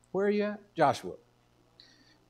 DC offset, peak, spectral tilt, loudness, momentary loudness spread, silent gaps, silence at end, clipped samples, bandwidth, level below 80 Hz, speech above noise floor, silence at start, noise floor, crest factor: under 0.1%; -12 dBFS; -6 dB/octave; -30 LUFS; 16 LU; none; 1.15 s; under 0.1%; 13 kHz; -74 dBFS; 36 dB; 0.15 s; -66 dBFS; 22 dB